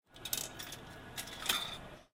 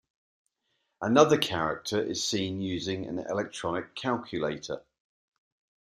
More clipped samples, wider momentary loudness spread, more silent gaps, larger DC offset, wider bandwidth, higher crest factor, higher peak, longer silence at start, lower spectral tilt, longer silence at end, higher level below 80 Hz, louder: neither; about the same, 12 LU vs 12 LU; neither; neither; about the same, 16 kHz vs 15.5 kHz; about the same, 28 dB vs 24 dB; second, -14 dBFS vs -6 dBFS; second, 0.1 s vs 1 s; second, -1 dB/octave vs -4.5 dB/octave; second, 0.1 s vs 1.2 s; about the same, -62 dBFS vs -66 dBFS; second, -39 LUFS vs -29 LUFS